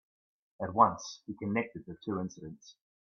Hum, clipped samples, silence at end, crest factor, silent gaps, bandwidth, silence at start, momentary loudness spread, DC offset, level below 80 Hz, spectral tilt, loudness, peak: none; under 0.1%; 0.3 s; 24 dB; none; 7.4 kHz; 0.6 s; 20 LU; under 0.1%; -70 dBFS; -5.5 dB/octave; -33 LUFS; -10 dBFS